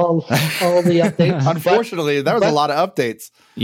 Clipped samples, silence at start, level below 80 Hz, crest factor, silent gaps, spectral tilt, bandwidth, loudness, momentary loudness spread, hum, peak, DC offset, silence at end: under 0.1%; 0 s; -56 dBFS; 14 dB; none; -6 dB/octave; 17 kHz; -17 LUFS; 7 LU; none; -4 dBFS; under 0.1%; 0 s